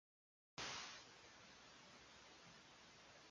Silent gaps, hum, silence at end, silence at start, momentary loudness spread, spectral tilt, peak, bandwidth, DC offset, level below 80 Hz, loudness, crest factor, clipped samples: none; none; 0 s; 0.55 s; 13 LU; -1.5 dB/octave; -38 dBFS; 10.5 kHz; under 0.1%; -82 dBFS; -57 LUFS; 22 dB; under 0.1%